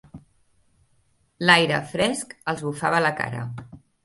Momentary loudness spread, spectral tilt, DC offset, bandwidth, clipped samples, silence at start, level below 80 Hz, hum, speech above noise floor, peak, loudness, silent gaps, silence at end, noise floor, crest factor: 15 LU; -4 dB/octave; under 0.1%; 12 kHz; under 0.1%; 0.15 s; -58 dBFS; none; 42 dB; 0 dBFS; -22 LUFS; none; 0.25 s; -65 dBFS; 24 dB